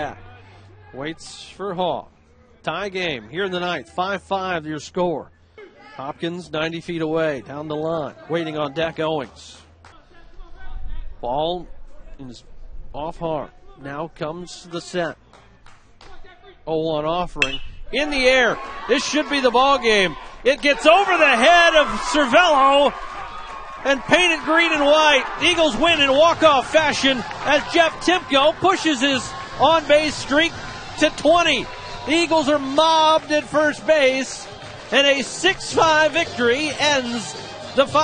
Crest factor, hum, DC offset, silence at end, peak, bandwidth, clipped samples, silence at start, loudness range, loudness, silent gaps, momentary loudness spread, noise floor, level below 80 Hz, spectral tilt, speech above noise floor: 20 dB; none; under 0.1%; 0 s; 0 dBFS; 9.6 kHz; under 0.1%; 0 s; 15 LU; -18 LUFS; none; 17 LU; -51 dBFS; -42 dBFS; -3 dB/octave; 33 dB